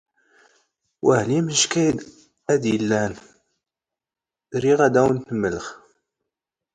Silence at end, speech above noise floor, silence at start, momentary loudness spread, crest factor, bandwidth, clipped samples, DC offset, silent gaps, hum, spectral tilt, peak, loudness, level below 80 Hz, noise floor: 1 s; 70 dB; 1.05 s; 14 LU; 20 dB; 9.6 kHz; under 0.1%; under 0.1%; none; none; -4.5 dB/octave; -4 dBFS; -21 LUFS; -56 dBFS; -90 dBFS